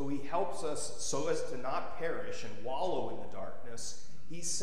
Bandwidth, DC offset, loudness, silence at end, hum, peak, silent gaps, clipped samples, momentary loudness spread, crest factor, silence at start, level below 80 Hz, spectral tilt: 15.5 kHz; 3%; -38 LUFS; 0 s; none; -18 dBFS; none; under 0.1%; 10 LU; 18 dB; 0 s; -62 dBFS; -3.5 dB/octave